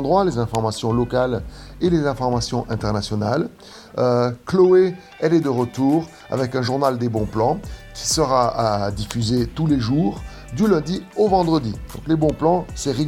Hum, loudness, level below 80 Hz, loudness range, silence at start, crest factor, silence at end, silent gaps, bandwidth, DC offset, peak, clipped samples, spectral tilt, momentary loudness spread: none; -20 LUFS; -40 dBFS; 3 LU; 0 s; 16 dB; 0 s; none; 16 kHz; under 0.1%; -4 dBFS; under 0.1%; -6 dB/octave; 8 LU